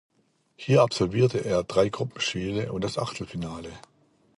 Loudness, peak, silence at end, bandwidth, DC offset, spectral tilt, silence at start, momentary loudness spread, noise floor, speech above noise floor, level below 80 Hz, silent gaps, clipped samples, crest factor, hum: -26 LUFS; -8 dBFS; 0.6 s; 11.5 kHz; under 0.1%; -5.5 dB/octave; 0.6 s; 14 LU; -67 dBFS; 42 dB; -54 dBFS; none; under 0.1%; 20 dB; none